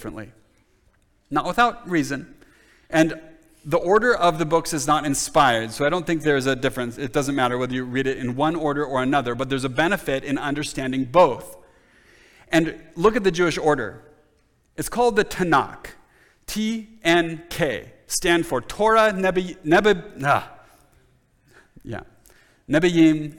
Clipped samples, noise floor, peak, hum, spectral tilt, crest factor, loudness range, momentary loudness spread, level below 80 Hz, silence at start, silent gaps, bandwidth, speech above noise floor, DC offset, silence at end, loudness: under 0.1%; -62 dBFS; -4 dBFS; none; -4.5 dB/octave; 18 dB; 4 LU; 14 LU; -48 dBFS; 0 s; none; 18.5 kHz; 41 dB; under 0.1%; 0 s; -21 LUFS